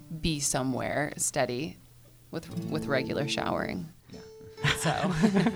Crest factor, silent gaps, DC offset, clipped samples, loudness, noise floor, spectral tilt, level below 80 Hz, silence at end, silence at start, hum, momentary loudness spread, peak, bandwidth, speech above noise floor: 20 dB; none; under 0.1%; under 0.1%; -29 LUFS; -54 dBFS; -4 dB/octave; -52 dBFS; 0 s; 0 s; none; 16 LU; -10 dBFS; over 20 kHz; 25 dB